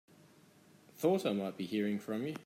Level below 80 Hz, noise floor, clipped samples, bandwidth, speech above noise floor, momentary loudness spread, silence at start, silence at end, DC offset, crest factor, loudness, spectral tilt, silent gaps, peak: -84 dBFS; -63 dBFS; under 0.1%; 16 kHz; 28 dB; 6 LU; 0.95 s; 0.05 s; under 0.1%; 18 dB; -35 LUFS; -6.5 dB/octave; none; -18 dBFS